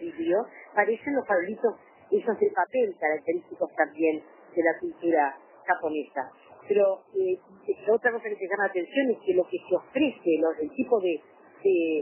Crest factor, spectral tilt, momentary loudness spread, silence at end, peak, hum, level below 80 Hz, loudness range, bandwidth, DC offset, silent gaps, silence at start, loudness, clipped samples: 20 dB; -9 dB/octave; 8 LU; 0 s; -8 dBFS; none; -74 dBFS; 1 LU; 3.2 kHz; under 0.1%; none; 0 s; -27 LUFS; under 0.1%